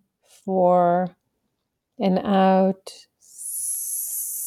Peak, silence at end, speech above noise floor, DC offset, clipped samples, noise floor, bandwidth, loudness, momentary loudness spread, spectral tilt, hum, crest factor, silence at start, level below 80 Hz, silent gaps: -6 dBFS; 0 s; 58 dB; under 0.1%; under 0.1%; -78 dBFS; 19 kHz; -22 LUFS; 16 LU; -5 dB/octave; none; 16 dB; 0.45 s; -70 dBFS; none